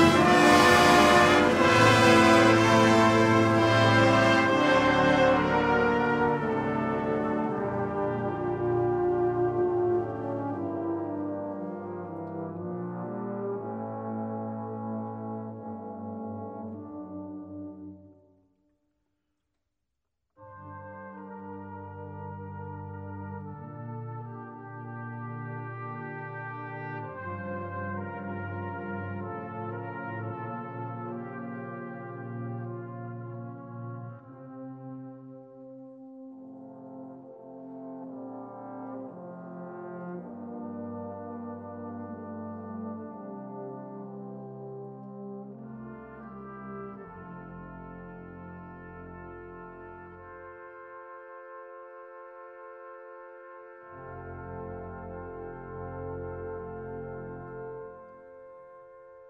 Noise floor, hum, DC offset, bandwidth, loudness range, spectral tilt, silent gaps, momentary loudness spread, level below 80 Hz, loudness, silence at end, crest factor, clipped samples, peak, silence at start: -84 dBFS; none; under 0.1%; 15.5 kHz; 24 LU; -5.5 dB/octave; none; 25 LU; -56 dBFS; -26 LUFS; 0 s; 22 dB; under 0.1%; -6 dBFS; 0 s